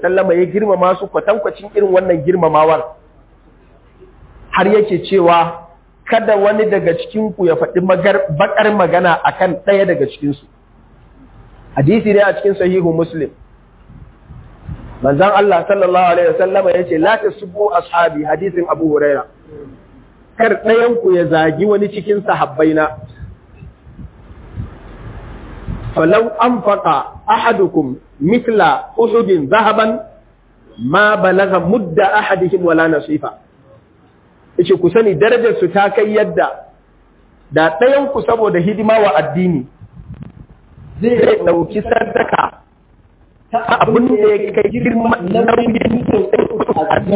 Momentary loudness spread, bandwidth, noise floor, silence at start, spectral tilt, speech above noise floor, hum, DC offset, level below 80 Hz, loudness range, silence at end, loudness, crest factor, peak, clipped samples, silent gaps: 11 LU; 4 kHz; -48 dBFS; 0 s; -10.5 dB/octave; 36 dB; none; under 0.1%; -42 dBFS; 3 LU; 0 s; -13 LUFS; 14 dB; 0 dBFS; under 0.1%; none